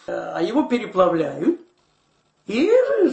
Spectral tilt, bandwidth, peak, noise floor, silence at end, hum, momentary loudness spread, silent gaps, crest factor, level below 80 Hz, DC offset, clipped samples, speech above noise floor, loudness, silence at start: -6.5 dB/octave; 8.4 kHz; -4 dBFS; -64 dBFS; 0 s; none; 11 LU; none; 18 dB; -60 dBFS; under 0.1%; under 0.1%; 45 dB; -20 LUFS; 0.1 s